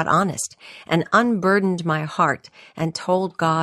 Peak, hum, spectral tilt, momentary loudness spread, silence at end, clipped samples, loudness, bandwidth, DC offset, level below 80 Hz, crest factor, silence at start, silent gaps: -4 dBFS; none; -5 dB/octave; 11 LU; 0 s; under 0.1%; -21 LUFS; 13.5 kHz; under 0.1%; -60 dBFS; 16 dB; 0 s; none